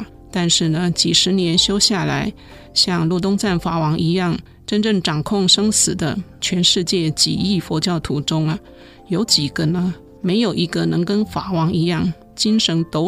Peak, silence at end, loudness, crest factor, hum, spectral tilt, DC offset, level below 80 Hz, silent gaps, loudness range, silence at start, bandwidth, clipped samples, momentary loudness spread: -2 dBFS; 0 s; -17 LUFS; 16 dB; none; -4 dB/octave; under 0.1%; -44 dBFS; none; 3 LU; 0 s; 15.5 kHz; under 0.1%; 9 LU